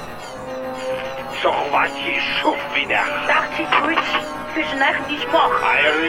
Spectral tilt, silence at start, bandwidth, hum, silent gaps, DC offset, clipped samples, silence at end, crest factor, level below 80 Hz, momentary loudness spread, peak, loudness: -3.5 dB/octave; 0 s; 16 kHz; none; none; under 0.1%; under 0.1%; 0 s; 18 dB; -50 dBFS; 11 LU; -2 dBFS; -19 LUFS